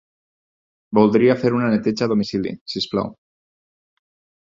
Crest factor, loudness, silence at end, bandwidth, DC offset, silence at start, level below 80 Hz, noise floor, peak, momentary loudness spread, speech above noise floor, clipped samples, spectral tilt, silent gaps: 20 dB; -19 LUFS; 1.4 s; 7.6 kHz; under 0.1%; 0.9 s; -56 dBFS; under -90 dBFS; -2 dBFS; 11 LU; over 72 dB; under 0.1%; -7 dB/octave; 2.61-2.66 s